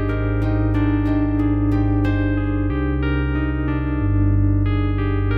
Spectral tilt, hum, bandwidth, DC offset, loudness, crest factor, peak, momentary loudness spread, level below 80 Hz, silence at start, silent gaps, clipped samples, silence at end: -10.5 dB/octave; none; 4.7 kHz; under 0.1%; -20 LUFS; 10 dB; -8 dBFS; 3 LU; -24 dBFS; 0 s; none; under 0.1%; 0 s